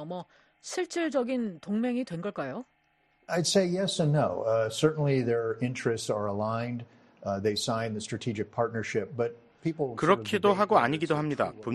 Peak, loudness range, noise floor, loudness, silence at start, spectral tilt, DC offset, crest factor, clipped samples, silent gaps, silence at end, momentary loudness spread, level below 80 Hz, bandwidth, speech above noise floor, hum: -8 dBFS; 4 LU; -69 dBFS; -29 LUFS; 0 s; -5.5 dB/octave; under 0.1%; 20 dB; under 0.1%; none; 0 s; 11 LU; -66 dBFS; 12.5 kHz; 41 dB; none